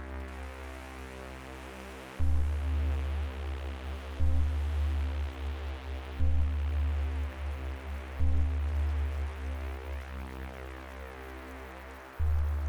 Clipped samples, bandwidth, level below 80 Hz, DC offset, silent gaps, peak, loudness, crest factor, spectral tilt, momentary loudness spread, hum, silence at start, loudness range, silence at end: under 0.1%; 9.6 kHz; -34 dBFS; under 0.1%; none; -16 dBFS; -35 LUFS; 14 dB; -7 dB/octave; 13 LU; none; 0 s; 5 LU; 0 s